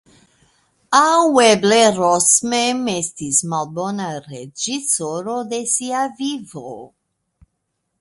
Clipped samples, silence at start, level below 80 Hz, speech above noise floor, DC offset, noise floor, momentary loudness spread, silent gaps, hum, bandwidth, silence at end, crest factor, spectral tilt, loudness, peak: under 0.1%; 0.9 s; -62 dBFS; 56 dB; under 0.1%; -74 dBFS; 17 LU; none; none; 12 kHz; 1.15 s; 18 dB; -2.5 dB/octave; -17 LUFS; 0 dBFS